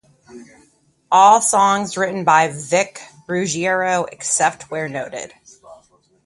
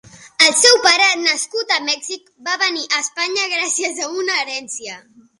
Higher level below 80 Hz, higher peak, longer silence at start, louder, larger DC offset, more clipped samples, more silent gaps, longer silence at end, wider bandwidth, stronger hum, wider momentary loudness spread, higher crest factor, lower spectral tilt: about the same, -62 dBFS vs -66 dBFS; about the same, 0 dBFS vs 0 dBFS; first, 0.35 s vs 0.15 s; about the same, -17 LUFS vs -15 LUFS; neither; neither; neither; about the same, 0.5 s vs 0.4 s; about the same, 11.5 kHz vs 11.5 kHz; neither; second, 15 LU vs 18 LU; about the same, 18 dB vs 18 dB; first, -3 dB/octave vs 1 dB/octave